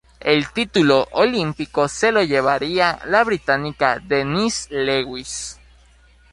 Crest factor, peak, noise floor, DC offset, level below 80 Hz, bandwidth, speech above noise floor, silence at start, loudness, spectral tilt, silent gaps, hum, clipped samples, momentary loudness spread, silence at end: 18 dB; -2 dBFS; -51 dBFS; under 0.1%; -48 dBFS; 11.5 kHz; 32 dB; 0.2 s; -19 LUFS; -4 dB/octave; none; none; under 0.1%; 7 LU; 0.8 s